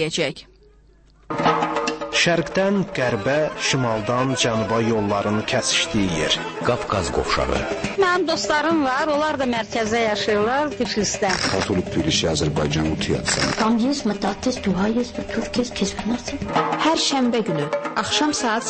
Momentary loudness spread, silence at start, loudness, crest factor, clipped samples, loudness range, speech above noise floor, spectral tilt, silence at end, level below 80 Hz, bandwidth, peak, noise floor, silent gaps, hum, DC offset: 5 LU; 0 s; -21 LUFS; 14 dB; under 0.1%; 2 LU; 31 dB; -4 dB/octave; 0 s; -42 dBFS; 8.8 kHz; -6 dBFS; -52 dBFS; none; none; under 0.1%